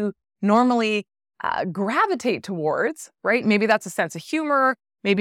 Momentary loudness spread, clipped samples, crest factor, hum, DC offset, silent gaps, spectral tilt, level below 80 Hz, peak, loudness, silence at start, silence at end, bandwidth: 8 LU; under 0.1%; 16 dB; none; under 0.1%; none; -5 dB/octave; -70 dBFS; -6 dBFS; -22 LUFS; 0 s; 0 s; 14.5 kHz